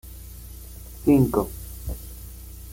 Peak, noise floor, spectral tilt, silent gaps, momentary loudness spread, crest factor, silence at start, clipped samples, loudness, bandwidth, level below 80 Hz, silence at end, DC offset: -6 dBFS; -40 dBFS; -7.5 dB/octave; none; 22 LU; 20 dB; 0.05 s; under 0.1%; -24 LUFS; 17 kHz; -38 dBFS; 0 s; under 0.1%